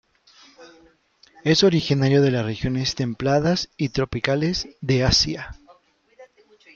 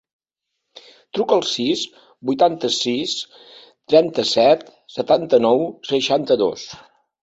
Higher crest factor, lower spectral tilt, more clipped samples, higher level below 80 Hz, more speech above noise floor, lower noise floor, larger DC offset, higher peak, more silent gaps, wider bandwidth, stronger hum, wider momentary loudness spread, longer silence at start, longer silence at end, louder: about the same, 20 dB vs 18 dB; about the same, -5 dB/octave vs -4 dB/octave; neither; first, -42 dBFS vs -62 dBFS; second, 35 dB vs 61 dB; second, -56 dBFS vs -79 dBFS; neither; about the same, -2 dBFS vs -2 dBFS; neither; about the same, 7.6 kHz vs 8.2 kHz; neither; second, 8 LU vs 13 LU; second, 0.6 s vs 1.15 s; about the same, 0.5 s vs 0.45 s; about the same, -21 LUFS vs -19 LUFS